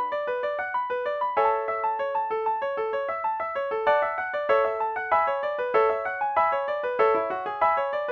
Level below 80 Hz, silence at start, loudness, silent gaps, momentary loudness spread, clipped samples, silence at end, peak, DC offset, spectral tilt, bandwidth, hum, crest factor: -66 dBFS; 0 s; -25 LUFS; none; 5 LU; under 0.1%; 0 s; -10 dBFS; under 0.1%; -5 dB/octave; 6.4 kHz; none; 16 dB